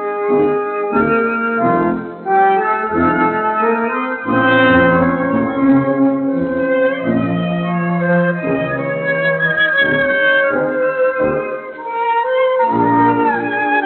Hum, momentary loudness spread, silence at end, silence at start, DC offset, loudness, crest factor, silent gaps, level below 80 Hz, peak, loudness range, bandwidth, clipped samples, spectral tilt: none; 6 LU; 0 s; 0 s; under 0.1%; -15 LUFS; 14 dB; none; -50 dBFS; -2 dBFS; 2 LU; 4.3 kHz; under 0.1%; -4.5 dB/octave